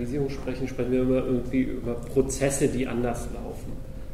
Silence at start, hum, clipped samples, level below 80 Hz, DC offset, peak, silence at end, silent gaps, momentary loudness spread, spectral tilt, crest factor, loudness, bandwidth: 0 s; none; under 0.1%; -38 dBFS; under 0.1%; -10 dBFS; 0 s; none; 13 LU; -6 dB/octave; 18 dB; -27 LUFS; 15.5 kHz